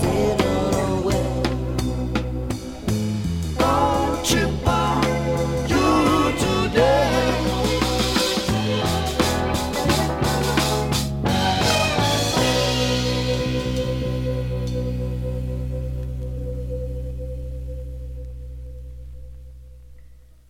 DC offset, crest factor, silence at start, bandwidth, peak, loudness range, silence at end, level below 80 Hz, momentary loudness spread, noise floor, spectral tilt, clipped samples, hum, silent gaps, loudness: under 0.1%; 18 dB; 0 s; 17 kHz; -4 dBFS; 12 LU; 0.35 s; -32 dBFS; 14 LU; -45 dBFS; -5 dB/octave; under 0.1%; none; none; -21 LUFS